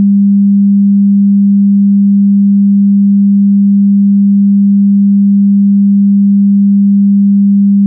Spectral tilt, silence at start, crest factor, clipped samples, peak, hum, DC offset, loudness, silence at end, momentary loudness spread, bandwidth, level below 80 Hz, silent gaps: -21.5 dB/octave; 0 s; 4 dB; under 0.1%; -4 dBFS; none; under 0.1%; -7 LUFS; 0 s; 0 LU; 0.3 kHz; -74 dBFS; none